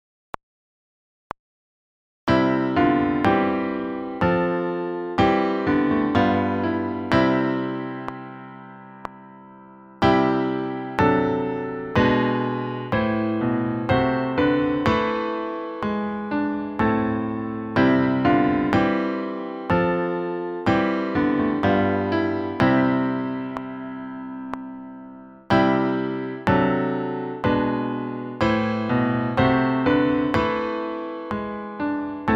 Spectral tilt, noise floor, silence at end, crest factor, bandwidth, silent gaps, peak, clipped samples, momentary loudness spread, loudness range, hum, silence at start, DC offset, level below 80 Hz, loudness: -8 dB/octave; -45 dBFS; 0 s; 20 dB; 7.6 kHz; none; -2 dBFS; under 0.1%; 14 LU; 4 LU; none; 2.25 s; under 0.1%; -46 dBFS; -22 LUFS